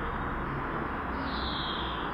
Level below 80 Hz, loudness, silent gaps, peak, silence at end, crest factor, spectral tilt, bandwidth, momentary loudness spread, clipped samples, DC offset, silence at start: -42 dBFS; -33 LUFS; none; -20 dBFS; 0 s; 14 dB; -7 dB/octave; 5.6 kHz; 2 LU; under 0.1%; under 0.1%; 0 s